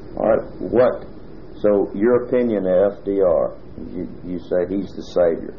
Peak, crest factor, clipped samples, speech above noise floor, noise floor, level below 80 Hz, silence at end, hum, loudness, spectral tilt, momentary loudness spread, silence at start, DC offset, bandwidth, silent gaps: -4 dBFS; 16 dB; under 0.1%; 20 dB; -39 dBFS; -44 dBFS; 0 s; none; -19 LUFS; -8.5 dB/octave; 15 LU; 0 s; 1%; 6.8 kHz; none